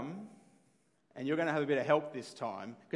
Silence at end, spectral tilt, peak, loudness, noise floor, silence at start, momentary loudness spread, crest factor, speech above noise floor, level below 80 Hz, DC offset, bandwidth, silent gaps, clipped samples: 0 s; -6 dB/octave; -14 dBFS; -34 LUFS; -72 dBFS; 0 s; 18 LU; 22 dB; 38 dB; under -90 dBFS; under 0.1%; 11.5 kHz; none; under 0.1%